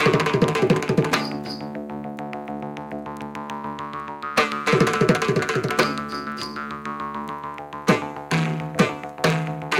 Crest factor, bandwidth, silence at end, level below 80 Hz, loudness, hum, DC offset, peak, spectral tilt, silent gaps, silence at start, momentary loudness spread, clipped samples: 18 dB; 16.5 kHz; 0 s; -54 dBFS; -24 LUFS; none; under 0.1%; -4 dBFS; -5.5 dB/octave; none; 0 s; 13 LU; under 0.1%